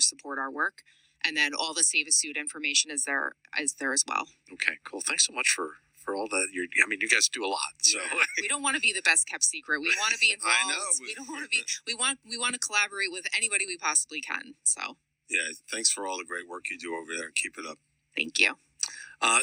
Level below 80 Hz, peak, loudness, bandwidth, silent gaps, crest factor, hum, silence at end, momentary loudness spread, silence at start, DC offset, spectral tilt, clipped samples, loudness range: -78 dBFS; -6 dBFS; -26 LUFS; 18.5 kHz; none; 24 dB; none; 0 s; 12 LU; 0 s; under 0.1%; 2 dB/octave; under 0.1%; 6 LU